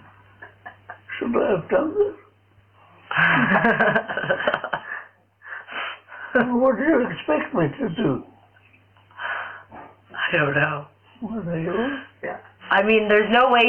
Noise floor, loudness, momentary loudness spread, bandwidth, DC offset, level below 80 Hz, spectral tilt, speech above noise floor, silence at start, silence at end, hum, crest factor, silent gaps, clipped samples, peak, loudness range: -57 dBFS; -22 LUFS; 19 LU; 5.4 kHz; under 0.1%; -56 dBFS; -8 dB/octave; 36 dB; 0.4 s; 0 s; none; 20 dB; none; under 0.1%; -2 dBFS; 5 LU